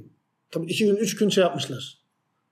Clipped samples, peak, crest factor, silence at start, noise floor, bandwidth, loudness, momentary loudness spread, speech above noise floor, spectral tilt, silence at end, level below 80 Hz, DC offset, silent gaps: under 0.1%; -8 dBFS; 18 dB; 0 s; -74 dBFS; 15.5 kHz; -24 LUFS; 14 LU; 51 dB; -4.5 dB/octave; 0.6 s; -78 dBFS; under 0.1%; none